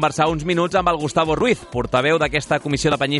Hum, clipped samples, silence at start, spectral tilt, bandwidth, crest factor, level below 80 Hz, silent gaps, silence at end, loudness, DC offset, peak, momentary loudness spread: none; under 0.1%; 0 s; -5 dB/octave; 11.5 kHz; 16 dB; -40 dBFS; none; 0 s; -19 LUFS; under 0.1%; -4 dBFS; 3 LU